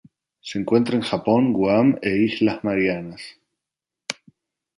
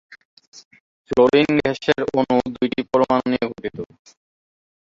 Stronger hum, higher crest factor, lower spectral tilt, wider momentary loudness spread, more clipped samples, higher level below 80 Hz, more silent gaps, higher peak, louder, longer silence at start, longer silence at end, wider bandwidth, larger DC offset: neither; about the same, 18 dB vs 18 dB; about the same, -6.5 dB/octave vs -6 dB/octave; first, 18 LU vs 15 LU; neither; about the same, -58 dBFS vs -54 dBFS; second, none vs 0.25-0.37 s, 0.47-0.52 s, 0.65-0.71 s, 0.80-1.05 s; about the same, -4 dBFS vs -2 dBFS; about the same, -20 LUFS vs -19 LUFS; first, 0.45 s vs 0.1 s; second, 0.65 s vs 1.1 s; first, 11.5 kHz vs 7.6 kHz; neither